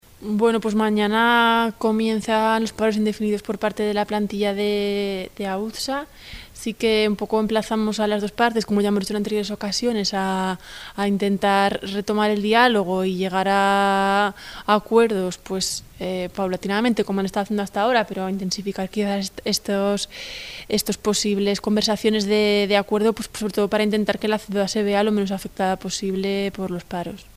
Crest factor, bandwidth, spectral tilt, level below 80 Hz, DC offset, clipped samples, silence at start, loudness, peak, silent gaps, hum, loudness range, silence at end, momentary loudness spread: 18 dB; 16 kHz; -4.5 dB/octave; -50 dBFS; under 0.1%; under 0.1%; 0.2 s; -21 LUFS; -2 dBFS; none; none; 4 LU; 0.15 s; 9 LU